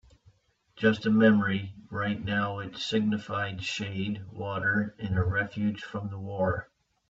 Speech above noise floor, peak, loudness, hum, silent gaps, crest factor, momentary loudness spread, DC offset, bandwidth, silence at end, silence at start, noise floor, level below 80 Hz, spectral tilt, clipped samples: 35 dB; -10 dBFS; -29 LUFS; none; none; 20 dB; 14 LU; under 0.1%; 7.8 kHz; 0.45 s; 0.75 s; -64 dBFS; -56 dBFS; -6.5 dB/octave; under 0.1%